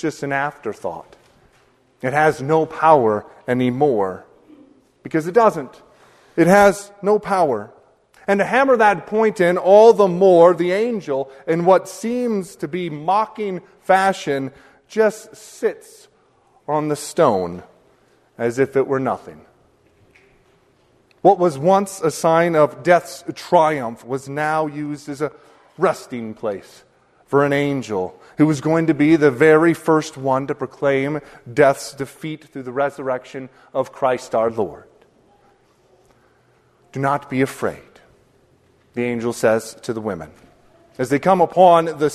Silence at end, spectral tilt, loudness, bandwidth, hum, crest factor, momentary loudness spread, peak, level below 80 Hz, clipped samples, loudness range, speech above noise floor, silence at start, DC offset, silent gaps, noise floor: 0 s; -6 dB/octave; -18 LUFS; 13.5 kHz; none; 18 dB; 16 LU; 0 dBFS; -58 dBFS; under 0.1%; 10 LU; 40 dB; 0.05 s; under 0.1%; none; -57 dBFS